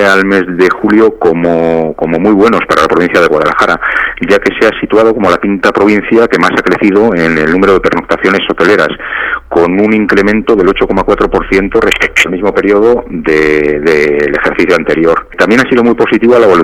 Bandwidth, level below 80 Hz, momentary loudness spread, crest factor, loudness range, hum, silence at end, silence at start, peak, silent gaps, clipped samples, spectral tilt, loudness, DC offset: 15 kHz; -32 dBFS; 4 LU; 8 dB; 1 LU; none; 0 s; 0 s; 0 dBFS; none; 0.5%; -5.5 dB/octave; -8 LUFS; under 0.1%